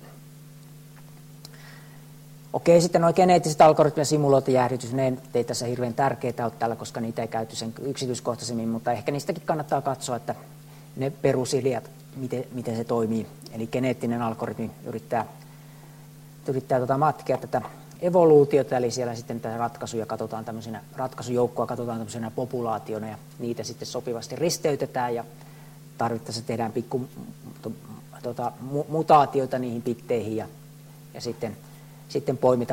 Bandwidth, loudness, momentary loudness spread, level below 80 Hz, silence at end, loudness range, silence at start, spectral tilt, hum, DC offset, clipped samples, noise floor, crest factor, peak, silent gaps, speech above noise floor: 16.5 kHz; -25 LUFS; 19 LU; -62 dBFS; 0 s; 9 LU; 0 s; -6 dB/octave; none; under 0.1%; under 0.1%; -46 dBFS; 20 dB; -6 dBFS; none; 21 dB